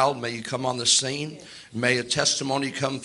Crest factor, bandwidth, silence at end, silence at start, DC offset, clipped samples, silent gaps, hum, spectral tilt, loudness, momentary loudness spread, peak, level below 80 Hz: 20 dB; 11.5 kHz; 0 s; 0 s; under 0.1%; under 0.1%; none; none; -2.5 dB/octave; -23 LUFS; 14 LU; -6 dBFS; -64 dBFS